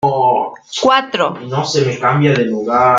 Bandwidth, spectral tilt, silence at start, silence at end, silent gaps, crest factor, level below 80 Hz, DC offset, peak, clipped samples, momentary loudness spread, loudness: 9 kHz; -5.5 dB/octave; 0 s; 0 s; none; 14 dB; -56 dBFS; under 0.1%; 0 dBFS; under 0.1%; 5 LU; -15 LUFS